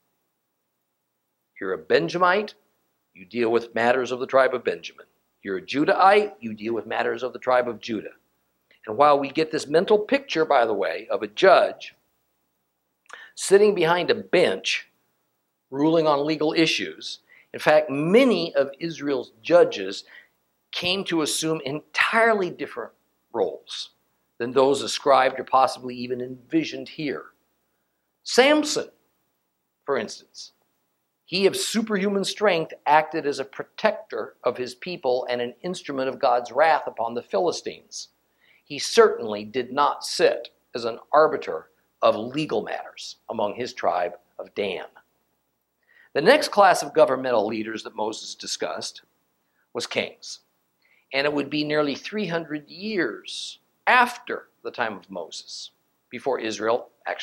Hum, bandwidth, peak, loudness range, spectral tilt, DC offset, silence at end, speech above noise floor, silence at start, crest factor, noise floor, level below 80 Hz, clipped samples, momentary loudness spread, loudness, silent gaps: none; 16.5 kHz; 0 dBFS; 5 LU; -4 dB/octave; under 0.1%; 0 s; 54 dB; 1.55 s; 24 dB; -77 dBFS; -72 dBFS; under 0.1%; 17 LU; -23 LUFS; none